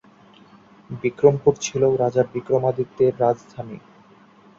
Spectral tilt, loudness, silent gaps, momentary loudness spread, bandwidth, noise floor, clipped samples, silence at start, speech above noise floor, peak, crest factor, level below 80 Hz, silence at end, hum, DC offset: -6 dB/octave; -21 LUFS; none; 18 LU; 7.6 kHz; -51 dBFS; under 0.1%; 0.9 s; 31 dB; -2 dBFS; 20 dB; -58 dBFS; 0.8 s; none; under 0.1%